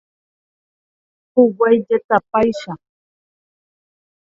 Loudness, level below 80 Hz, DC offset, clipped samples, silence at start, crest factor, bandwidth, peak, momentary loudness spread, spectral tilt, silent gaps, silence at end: -16 LUFS; -56 dBFS; under 0.1%; under 0.1%; 1.35 s; 20 dB; 7.6 kHz; 0 dBFS; 16 LU; -7 dB/octave; 2.04-2.09 s; 1.55 s